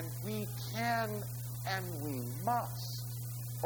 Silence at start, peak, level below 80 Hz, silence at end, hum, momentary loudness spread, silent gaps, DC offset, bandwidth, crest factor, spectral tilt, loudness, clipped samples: 0 s; -20 dBFS; -62 dBFS; 0 s; 60 Hz at -40 dBFS; 7 LU; none; under 0.1%; over 20 kHz; 18 dB; -5 dB/octave; -38 LUFS; under 0.1%